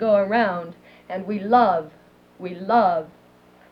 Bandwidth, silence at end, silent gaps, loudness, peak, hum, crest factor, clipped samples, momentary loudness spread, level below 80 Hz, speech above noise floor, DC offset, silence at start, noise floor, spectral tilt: 5.6 kHz; 0.65 s; none; -21 LUFS; -4 dBFS; none; 18 dB; under 0.1%; 20 LU; -68 dBFS; 32 dB; under 0.1%; 0 s; -52 dBFS; -8 dB/octave